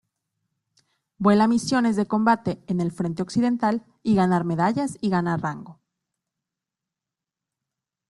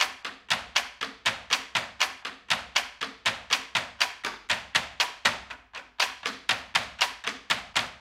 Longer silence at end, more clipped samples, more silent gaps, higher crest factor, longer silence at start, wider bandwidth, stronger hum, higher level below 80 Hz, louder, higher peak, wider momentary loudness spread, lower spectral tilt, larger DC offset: first, 2.35 s vs 0 s; neither; neither; second, 18 dB vs 26 dB; first, 1.2 s vs 0 s; second, 12 kHz vs 16.5 kHz; neither; about the same, -62 dBFS vs -62 dBFS; first, -23 LUFS vs -28 LUFS; about the same, -6 dBFS vs -6 dBFS; about the same, 8 LU vs 9 LU; first, -6.5 dB/octave vs 0 dB/octave; neither